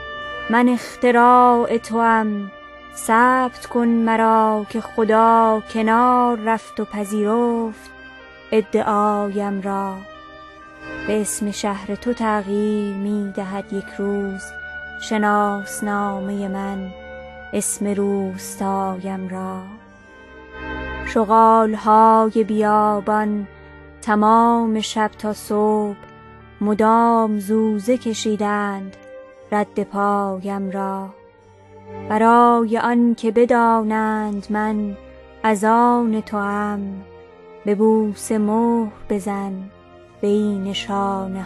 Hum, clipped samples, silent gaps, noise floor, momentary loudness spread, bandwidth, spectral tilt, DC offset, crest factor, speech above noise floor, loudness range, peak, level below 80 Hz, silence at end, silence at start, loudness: none; under 0.1%; none; -47 dBFS; 16 LU; 12.5 kHz; -5.5 dB/octave; under 0.1%; 16 dB; 29 dB; 7 LU; -2 dBFS; -50 dBFS; 0 s; 0 s; -19 LUFS